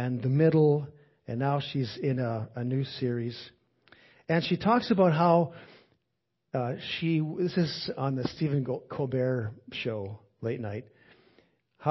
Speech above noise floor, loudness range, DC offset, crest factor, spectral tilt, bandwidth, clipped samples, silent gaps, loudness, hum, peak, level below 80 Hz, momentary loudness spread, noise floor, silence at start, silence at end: 53 dB; 5 LU; under 0.1%; 20 dB; -8.5 dB/octave; 6 kHz; under 0.1%; none; -29 LUFS; none; -10 dBFS; -64 dBFS; 14 LU; -81 dBFS; 0 s; 0 s